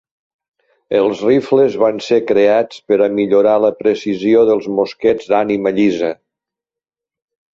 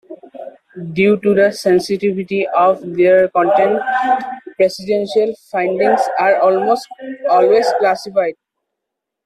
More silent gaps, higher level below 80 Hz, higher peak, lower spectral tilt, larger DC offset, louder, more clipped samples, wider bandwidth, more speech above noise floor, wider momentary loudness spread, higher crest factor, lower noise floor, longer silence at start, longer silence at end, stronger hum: neither; about the same, -58 dBFS vs -60 dBFS; about the same, -2 dBFS vs -2 dBFS; about the same, -6.5 dB/octave vs -5.5 dB/octave; neither; about the same, -14 LUFS vs -15 LUFS; neither; second, 7.6 kHz vs 13.5 kHz; first, 74 dB vs 65 dB; second, 5 LU vs 12 LU; about the same, 14 dB vs 14 dB; first, -87 dBFS vs -79 dBFS; first, 0.9 s vs 0.1 s; first, 1.4 s vs 0.9 s; neither